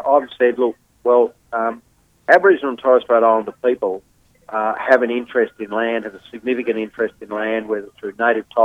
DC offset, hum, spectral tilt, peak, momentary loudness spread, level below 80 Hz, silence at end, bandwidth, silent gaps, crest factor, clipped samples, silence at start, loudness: under 0.1%; none; -6 dB/octave; 0 dBFS; 11 LU; -62 dBFS; 0 s; 7.8 kHz; none; 18 dB; under 0.1%; 0 s; -18 LUFS